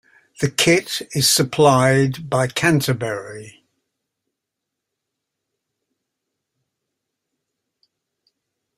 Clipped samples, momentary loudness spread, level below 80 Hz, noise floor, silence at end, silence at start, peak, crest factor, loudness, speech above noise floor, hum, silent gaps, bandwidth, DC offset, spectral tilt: under 0.1%; 12 LU; -56 dBFS; -82 dBFS; 5.3 s; 0.4 s; 0 dBFS; 22 dB; -17 LUFS; 64 dB; none; none; 15.5 kHz; under 0.1%; -4 dB/octave